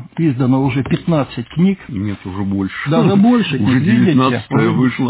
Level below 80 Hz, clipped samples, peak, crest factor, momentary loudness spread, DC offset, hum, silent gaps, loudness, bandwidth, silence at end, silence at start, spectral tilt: -44 dBFS; under 0.1%; -2 dBFS; 12 dB; 10 LU; under 0.1%; none; none; -15 LUFS; 4 kHz; 0 s; 0 s; -11.5 dB/octave